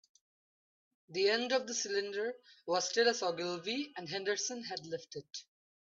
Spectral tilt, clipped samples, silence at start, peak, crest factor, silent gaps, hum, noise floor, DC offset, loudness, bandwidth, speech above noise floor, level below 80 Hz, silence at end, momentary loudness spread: -2 dB/octave; under 0.1%; 1.1 s; -16 dBFS; 22 dB; none; none; under -90 dBFS; under 0.1%; -35 LUFS; 7.8 kHz; over 54 dB; -86 dBFS; 0.5 s; 14 LU